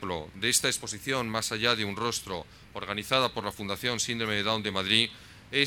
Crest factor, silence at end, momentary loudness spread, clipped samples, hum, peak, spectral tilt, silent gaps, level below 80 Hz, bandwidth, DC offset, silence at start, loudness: 24 dB; 0 s; 11 LU; under 0.1%; none; -6 dBFS; -2.5 dB/octave; none; -58 dBFS; 19.5 kHz; under 0.1%; 0 s; -28 LUFS